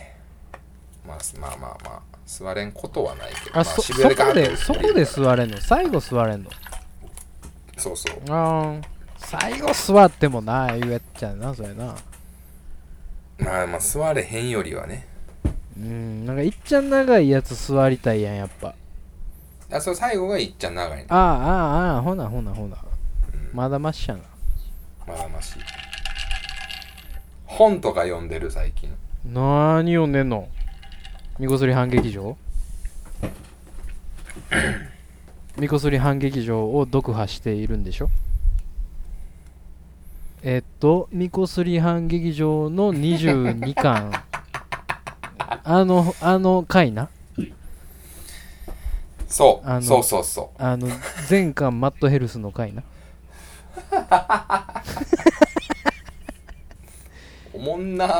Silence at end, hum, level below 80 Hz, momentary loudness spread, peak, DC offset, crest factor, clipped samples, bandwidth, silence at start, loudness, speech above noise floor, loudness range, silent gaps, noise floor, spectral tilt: 0 s; none; -34 dBFS; 21 LU; 0 dBFS; under 0.1%; 22 dB; under 0.1%; over 20 kHz; 0 s; -22 LUFS; 24 dB; 9 LU; none; -45 dBFS; -5.5 dB/octave